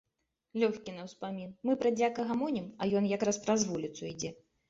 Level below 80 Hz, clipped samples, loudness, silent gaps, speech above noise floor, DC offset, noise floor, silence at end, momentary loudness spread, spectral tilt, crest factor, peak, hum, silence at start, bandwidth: -70 dBFS; under 0.1%; -33 LUFS; none; 51 dB; under 0.1%; -83 dBFS; 0.35 s; 12 LU; -5 dB/octave; 20 dB; -14 dBFS; none; 0.55 s; 8 kHz